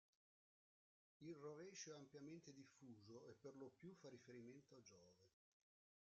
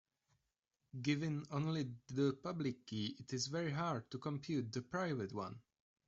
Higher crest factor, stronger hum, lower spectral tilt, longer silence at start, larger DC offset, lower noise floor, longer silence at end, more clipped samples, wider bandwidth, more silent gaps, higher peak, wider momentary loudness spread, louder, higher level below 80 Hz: about the same, 20 dB vs 18 dB; neither; about the same, -5 dB/octave vs -5.5 dB/octave; first, 1.2 s vs 0.95 s; neither; about the same, under -90 dBFS vs -88 dBFS; first, 0.75 s vs 0.5 s; neither; about the same, 7.4 kHz vs 8 kHz; neither; second, -44 dBFS vs -24 dBFS; about the same, 8 LU vs 6 LU; second, -62 LUFS vs -42 LUFS; second, under -90 dBFS vs -76 dBFS